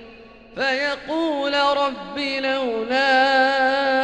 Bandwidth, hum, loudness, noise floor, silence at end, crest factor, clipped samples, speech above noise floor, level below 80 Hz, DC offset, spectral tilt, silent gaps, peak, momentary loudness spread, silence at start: 9.4 kHz; none; -20 LUFS; -44 dBFS; 0 s; 16 dB; under 0.1%; 24 dB; -56 dBFS; under 0.1%; -3 dB/octave; none; -6 dBFS; 8 LU; 0 s